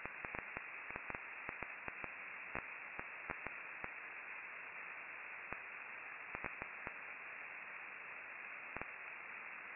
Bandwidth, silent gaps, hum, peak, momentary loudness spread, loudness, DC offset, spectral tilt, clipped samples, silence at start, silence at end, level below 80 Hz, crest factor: 3.9 kHz; none; none; -22 dBFS; 2 LU; -47 LUFS; under 0.1%; 2 dB/octave; under 0.1%; 0 s; 0 s; -72 dBFS; 26 dB